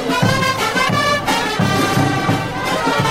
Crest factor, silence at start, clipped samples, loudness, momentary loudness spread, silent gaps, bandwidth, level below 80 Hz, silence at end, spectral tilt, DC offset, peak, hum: 14 dB; 0 s; under 0.1%; -16 LUFS; 3 LU; none; 16 kHz; -40 dBFS; 0 s; -4.5 dB/octave; under 0.1%; -2 dBFS; none